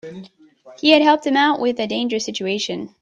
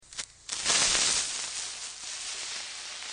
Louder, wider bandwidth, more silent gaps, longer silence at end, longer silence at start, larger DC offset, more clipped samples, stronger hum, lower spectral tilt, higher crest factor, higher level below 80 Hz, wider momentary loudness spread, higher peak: first, -18 LUFS vs -28 LUFS; about the same, 9.2 kHz vs 10 kHz; neither; first, 0.15 s vs 0 s; about the same, 0.05 s vs 0.05 s; neither; neither; neither; first, -3.5 dB/octave vs 1.5 dB/octave; second, 20 dB vs 26 dB; about the same, -64 dBFS vs -60 dBFS; second, 10 LU vs 14 LU; first, 0 dBFS vs -6 dBFS